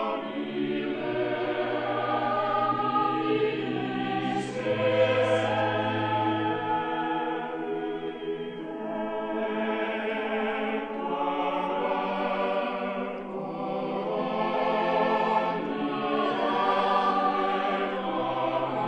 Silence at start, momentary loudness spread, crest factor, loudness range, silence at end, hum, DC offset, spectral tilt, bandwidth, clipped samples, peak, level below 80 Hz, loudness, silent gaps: 0 s; 8 LU; 16 dB; 5 LU; 0 s; none; under 0.1%; -6.5 dB/octave; 9.6 kHz; under 0.1%; -12 dBFS; -64 dBFS; -28 LUFS; none